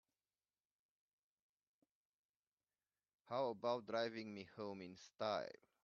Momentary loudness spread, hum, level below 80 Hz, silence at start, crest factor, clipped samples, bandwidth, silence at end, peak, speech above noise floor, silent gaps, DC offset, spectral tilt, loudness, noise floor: 12 LU; none; under -90 dBFS; 3.25 s; 22 dB; under 0.1%; 7.2 kHz; 0.35 s; -28 dBFS; over 45 dB; none; under 0.1%; -3.5 dB/octave; -46 LUFS; under -90 dBFS